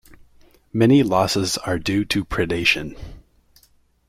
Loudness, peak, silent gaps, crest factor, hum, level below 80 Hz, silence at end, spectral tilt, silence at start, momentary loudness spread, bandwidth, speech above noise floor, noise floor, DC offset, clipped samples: -19 LUFS; -4 dBFS; none; 18 dB; none; -44 dBFS; 0.9 s; -5 dB/octave; 0.75 s; 11 LU; 16 kHz; 39 dB; -58 dBFS; under 0.1%; under 0.1%